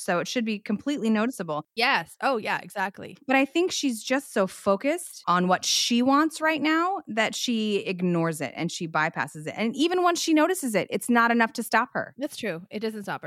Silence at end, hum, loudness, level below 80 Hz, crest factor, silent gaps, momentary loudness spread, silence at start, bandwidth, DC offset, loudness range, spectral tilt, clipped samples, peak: 0 s; none; -25 LUFS; -76 dBFS; 18 dB; none; 10 LU; 0 s; 16 kHz; under 0.1%; 3 LU; -4 dB/octave; under 0.1%; -6 dBFS